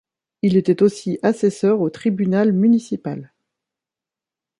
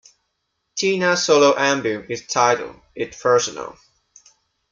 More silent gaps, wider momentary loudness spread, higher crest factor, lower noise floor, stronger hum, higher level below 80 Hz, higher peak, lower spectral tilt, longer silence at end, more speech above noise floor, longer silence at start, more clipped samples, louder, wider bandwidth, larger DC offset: neither; second, 11 LU vs 17 LU; about the same, 16 dB vs 18 dB; first, -88 dBFS vs -74 dBFS; neither; about the same, -62 dBFS vs -62 dBFS; about the same, -4 dBFS vs -2 dBFS; first, -7.5 dB/octave vs -3 dB/octave; first, 1.35 s vs 1 s; first, 71 dB vs 55 dB; second, 0.45 s vs 0.75 s; neither; about the same, -18 LUFS vs -19 LUFS; first, 11.5 kHz vs 7.8 kHz; neither